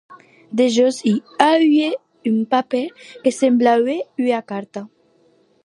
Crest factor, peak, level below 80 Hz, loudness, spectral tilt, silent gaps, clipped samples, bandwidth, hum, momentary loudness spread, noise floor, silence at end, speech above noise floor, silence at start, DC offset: 18 dB; 0 dBFS; -74 dBFS; -18 LUFS; -5 dB/octave; none; under 0.1%; 11.5 kHz; none; 13 LU; -57 dBFS; 0.8 s; 40 dB; 0.1 s; under 0.1%